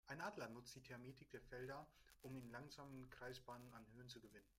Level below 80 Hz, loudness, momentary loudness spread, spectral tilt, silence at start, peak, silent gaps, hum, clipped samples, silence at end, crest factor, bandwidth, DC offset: -76 dBFS; -57 LUFS; 9 LU; -5 dB/octave; 0.05 s; -38 dBFS; none; none; under 0.1%; 0.05 s; 20 dB; 16 kHz; under 0.1%